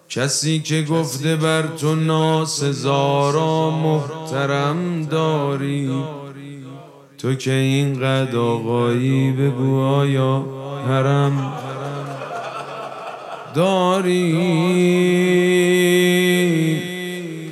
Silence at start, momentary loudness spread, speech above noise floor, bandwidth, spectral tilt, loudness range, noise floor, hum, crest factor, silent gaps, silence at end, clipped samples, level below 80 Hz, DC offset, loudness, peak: 0.1 s; 13 LU; 22 dB; 14 kHz; -5.5 dB/octave; 6 LU; -40 dBFS; none; 16 dB; none; 0 s; under 0.1%; -70 dBFS; under 0.1%; -19 LUFS; -4 dBFS